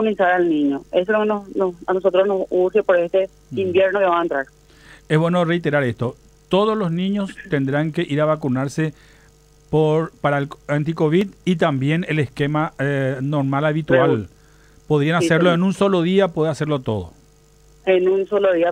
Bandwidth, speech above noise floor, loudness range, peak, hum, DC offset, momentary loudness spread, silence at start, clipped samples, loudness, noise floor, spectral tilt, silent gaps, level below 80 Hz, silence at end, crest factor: 11 kHz; 33 dB; 3 LU; -2 dBFS; none; under 0.1%; 7 LU; 0 s; under 0.1%; -19 LUFS; -51 dBFS; -7 dB/octave; none; -52 dBFS; 0 s; 18 dB